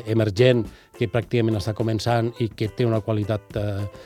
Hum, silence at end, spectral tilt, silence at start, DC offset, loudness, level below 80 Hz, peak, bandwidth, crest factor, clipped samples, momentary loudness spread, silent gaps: none; 0 s; -7 dB/octave; 0 s; under 0.1%; -23 LUFS; -50 dBFS; -4 dBFS; 14 kHz; 20 dB; under 0.1%; 9 LU; none